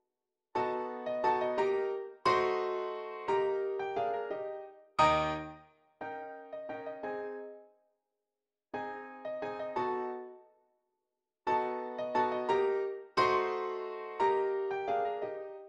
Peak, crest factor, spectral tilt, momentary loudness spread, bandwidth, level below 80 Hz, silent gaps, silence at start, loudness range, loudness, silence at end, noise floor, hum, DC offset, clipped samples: -14 dBFS; 20 dB; -5.5 dB/octave; 14 LU; 8.4 kHz; -66 dBFS; none; 0.55 s; 11 LU; -34 LUFS; 0 s; under -90 dBFS; none; under 0.1%; under 0.1%